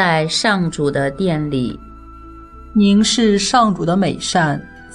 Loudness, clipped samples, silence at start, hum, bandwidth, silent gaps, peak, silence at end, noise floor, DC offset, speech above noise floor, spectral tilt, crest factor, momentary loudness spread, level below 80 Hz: -16 LUFS; under 0.1%; 0 s; none; 11 kHz; none; -2 dBFS; 0 s; -37 dBFS; under 0.1%; 21 dB; -4.5 dB/octave; 14 dB; 8 LU; -40 dBFS